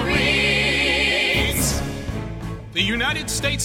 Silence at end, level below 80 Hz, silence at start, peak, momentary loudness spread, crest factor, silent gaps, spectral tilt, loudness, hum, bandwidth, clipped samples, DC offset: 0 s; -34 dBFS; 0 s; -6 dBFS; 13 LU; 16 dB; none; -3 dB/octave; -19 LUFS; none; 17 kHz; under 0.1%; under 0.1%